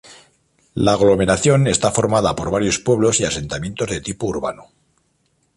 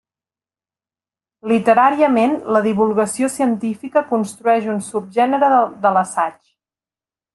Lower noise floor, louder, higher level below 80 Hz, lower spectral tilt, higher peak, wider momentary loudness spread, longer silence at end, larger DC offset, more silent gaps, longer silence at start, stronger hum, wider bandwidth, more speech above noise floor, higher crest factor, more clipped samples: second, -64 dBFS vs under -90 dBFS; about the same, -18 LUFS vs -17 LUFS; first, -42 dBFS vs -64 dBFS; about the same, -4.5 dB/octave vs -5.5 dB/octave; about the same, -2 dBFS vs -2 dBFS; about the same, 9 LU vs 9 LU; about the same, 0.95 s vs 1.05 s; neither; neither; second, 0.1 s vs 1.45 s; neither; about the same, 11.5 kHz vs 12.5 kHz; second, 47 dB vs over 74 dB; about the same, 16 dB vs 16 dB; neither